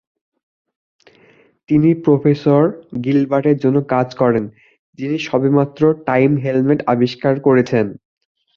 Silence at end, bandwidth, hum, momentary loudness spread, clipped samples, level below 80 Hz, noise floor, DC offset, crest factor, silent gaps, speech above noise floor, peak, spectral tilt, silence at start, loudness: 0.6 s; 7 kHz; none; 7 LU; under 0.1%; -56 dBFS; -51 dBFS; under 0.1%; 14 dB; 4.79-4.93 s; 36 dB; -2 dBFS; -8.5 dB/octave; 1.7 s; -16 LUFS